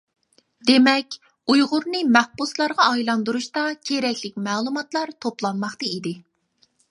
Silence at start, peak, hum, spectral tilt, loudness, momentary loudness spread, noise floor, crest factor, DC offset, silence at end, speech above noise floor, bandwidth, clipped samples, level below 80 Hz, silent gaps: 0.65 s; 0 dBFS; none; -3.5 dB/octave; -21 LUFS; 10 LU; -64 dBFS; 22 dB; under 0.1%; 0.7 s; 43 dB; 11.5 kHz; under 0.1%; -72 dBFS; none